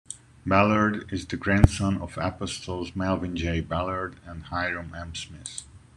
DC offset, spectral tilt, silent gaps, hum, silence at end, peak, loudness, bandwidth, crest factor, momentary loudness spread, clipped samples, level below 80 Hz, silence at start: under 0.1%; -6 dB/octave; none; none; 0.2 s; -2 dBFS; -27 LUFS; 11.5 kHz; 24 dB; 16 LU; under 0.1%; -40 dBFS; 0.1 s